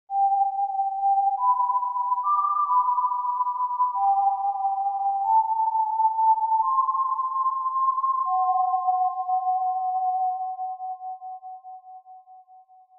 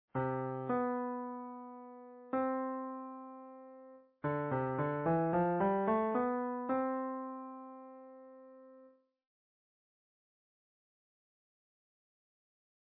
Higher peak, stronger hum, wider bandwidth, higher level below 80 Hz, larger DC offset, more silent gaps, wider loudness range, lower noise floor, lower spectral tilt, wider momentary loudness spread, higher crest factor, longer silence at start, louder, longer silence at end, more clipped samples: first, -12 dBFS vs -22 dBFS; neither; second, 1.4 kHz vs 4 kHz; second, -84 dBFS vs -72 dBFS; neither; neither; second, 5 LU vs 11 LU; second, -53 dBFS vs -63 dBFS; second, -3.5 dB/octave vs -8.5 dB/octave; second, 11 LU vs 21 LU; second, 12 dB vs 18 dB; about the same, 0.1 s vs 0.15 s; first, -24 LUFS vs -36 LUFS; second, 0.4 s vs 4 s; neither